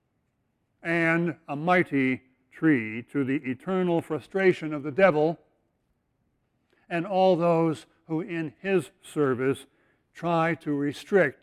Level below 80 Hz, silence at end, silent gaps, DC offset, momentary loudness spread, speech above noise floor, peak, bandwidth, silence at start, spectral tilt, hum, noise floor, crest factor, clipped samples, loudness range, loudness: -68 dBFS; 0.1 s; none; under 0.1%; 11 LU; 49 dB; -6 dBFS; 13 kHz; 0.85 s; -7.5 dB/octave; none; -74 dBFS; 20 dB; under 0.1%; 2 LU; -26 LUFS